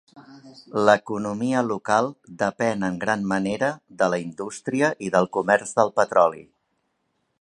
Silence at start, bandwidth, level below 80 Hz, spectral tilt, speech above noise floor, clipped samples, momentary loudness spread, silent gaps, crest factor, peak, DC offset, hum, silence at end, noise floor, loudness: 0.15 s; 11.5 kHz; -64 dBFS; -5.5 dB/octave; 50 dB; under 0.1%; 9 LU; none; 22 dB; -2 dBFS; under 0.1%; none; 1 s; -73 dBFS; -23 LUFS